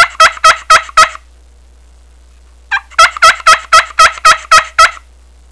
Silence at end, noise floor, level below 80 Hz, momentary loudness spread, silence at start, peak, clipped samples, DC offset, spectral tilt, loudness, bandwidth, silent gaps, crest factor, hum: 0.6 s; -40 dBFS; -36 dBFS; 5 LU; 0 s; 0 dBFS; 4%; 0.5%; 1 dB/octave; -7 LUFS; 11 kHz; none; 10 dB; none